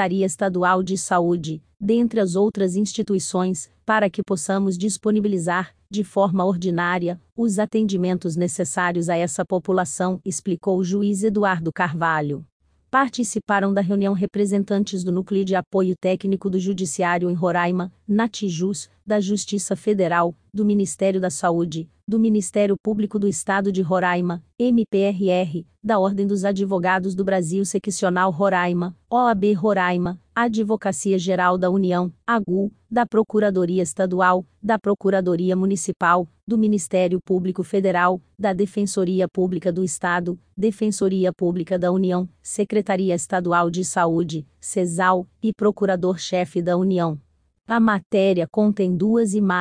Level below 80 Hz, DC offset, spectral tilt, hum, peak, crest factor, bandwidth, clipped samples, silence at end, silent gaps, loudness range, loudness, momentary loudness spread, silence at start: -58 dBFS; under 0.1%; -5.5 dB/octave; none; -4 dBFS; 16 dB; 10.5 kHz; under 0.1%; 0 s; 7.32-7.36 s, 12.52-12.60 s, 15.67-15.71 s, 22.80-22.84 s, 36.43-36.47 s, 48.06-48.10 s; 2 LU; -21 LUFS; 5 LU; 0 s